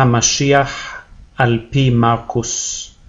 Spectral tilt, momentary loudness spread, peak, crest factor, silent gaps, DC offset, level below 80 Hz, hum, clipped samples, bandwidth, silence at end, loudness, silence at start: -4 dB/octave; 12 LU; 0 dBFS; 16 dB; none; under 0.1%; -40 dBFS; none; under 0.1%; 7.8 kHz; 0.2 s; -15 LUFS; 0 s